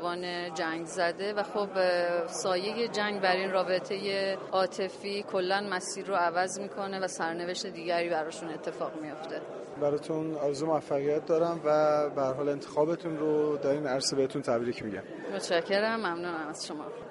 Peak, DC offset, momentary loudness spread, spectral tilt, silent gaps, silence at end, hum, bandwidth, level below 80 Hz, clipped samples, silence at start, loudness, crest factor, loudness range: -12 dBFS; under 0.1%; 9 LU; -4 dB/octave; none; 0 s; none; 11.5 kHz; -74 dBFS; under 0.1%; 0 s; -31 LUFS; 20 dB; 4 LU